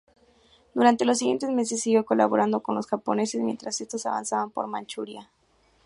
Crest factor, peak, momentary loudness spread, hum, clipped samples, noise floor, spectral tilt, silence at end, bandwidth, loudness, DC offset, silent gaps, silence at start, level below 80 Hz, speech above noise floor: 20 dB; -6 dBFS; 12 LU; none; under 0.1%; -64 dBFS; -4 dB/octave; 0.6 s; 11.5 kHz; -25 LUFS; under 0.1%; none; 0.75 s; -72 dBFS; 39 dB